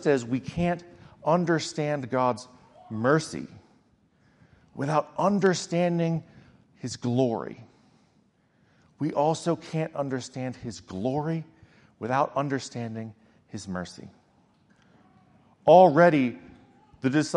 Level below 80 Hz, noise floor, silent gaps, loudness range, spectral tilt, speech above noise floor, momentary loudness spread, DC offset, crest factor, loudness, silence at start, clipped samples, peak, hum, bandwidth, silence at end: -62 dBFS; -65 dBFS; none; 9 LU; -6 dB/octave; 40 dB; 18 LU; under 0.1%; 22 dB; -26 LUFS; 0 s; under 0.1%; -4 dBFS; none; 11 kHz; 0 s